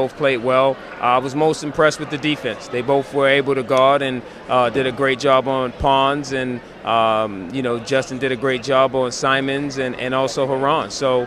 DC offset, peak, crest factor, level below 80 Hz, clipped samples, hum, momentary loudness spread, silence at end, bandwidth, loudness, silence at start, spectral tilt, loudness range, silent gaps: under 0.1%; -2 dBFS; 16 dB; -46 dBFS; under 0.1%; none; 8 LU; 0 s; 13 kHz; -19 LUFS; 0 s; -4.5 dB/octave; 2 LU; none